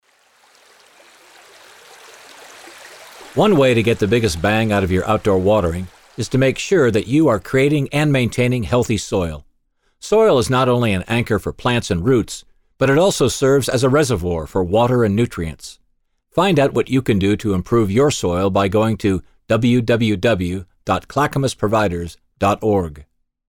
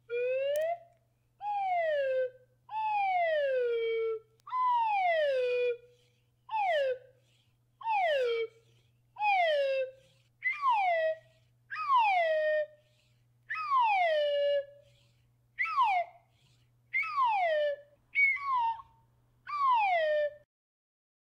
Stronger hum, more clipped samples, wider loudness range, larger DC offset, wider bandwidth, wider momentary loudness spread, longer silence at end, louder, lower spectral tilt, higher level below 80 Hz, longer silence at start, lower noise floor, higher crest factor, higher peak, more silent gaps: neither; neither; about the same, 2 LU vs 3 LU; neither; first, 18 kHz vs 16 kHz; about the same, 12 LU vs 13 LU; second, 0.45 s vs 0.95 s; first, -17 LUFS vs -30 LUFS; first, -6 dB/octave vs -1.5 dB/octave; first, -40 dBFS vs -78 dBFS; first, 2.4 s vs 0.1 s; second, -64 dBFS vs -70 dBFS; about the same, 14 dB vs 14 dB; first, -4 dBFS vs -18 dBFS; neither